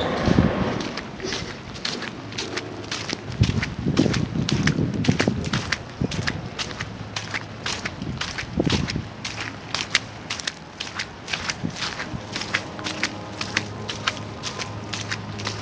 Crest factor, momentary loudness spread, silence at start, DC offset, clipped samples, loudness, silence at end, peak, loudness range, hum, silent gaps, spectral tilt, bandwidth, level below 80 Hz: 26 dB; 9 LU; 0 s; under 0.1%; under 0.1%; -26 LUFS; 0 s; 0 dBFS; 4 LU; none; none; -4.5 dB/octave; 8 kHz; -40 dBFS